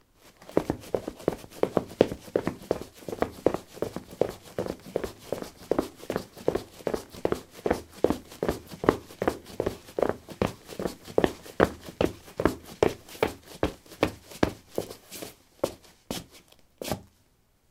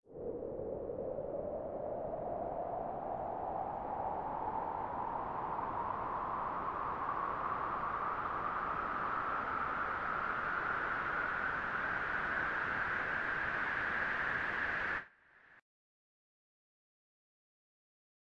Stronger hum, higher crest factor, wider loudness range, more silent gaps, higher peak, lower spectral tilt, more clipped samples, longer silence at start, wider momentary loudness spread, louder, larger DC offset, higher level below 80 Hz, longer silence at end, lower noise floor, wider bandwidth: neither; first, 30 dB vs 14 dB; about the same, 4 LU vs 5 LU; neither; first, -2 dBFS vs -24 dBFS; about the same, -5.5 dB/octave vs -6.5 dB/octave; neither; first, 0.25 s vs 0.1 s; first, 10 LU vs 6 LU; first, -31 LUFS vs -37 LUFS; neither; first, -50 dBFS vs -60 dBFS; second, 0.7 s vs 2.65 s; about the same, -65 dBFS vs -64 dBFS; first, 17.5 kHz vs 9 kHz